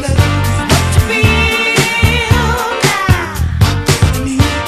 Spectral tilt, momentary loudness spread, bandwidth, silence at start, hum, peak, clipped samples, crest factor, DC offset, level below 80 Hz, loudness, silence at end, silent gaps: -4.5 dB/octave; 3 LU; 14.5 kHz; 0 s; none; 0 dBFS; 0.3%; 12 dB; under 0.1%; -20 dBFS; -12 LUFS; 0 s; none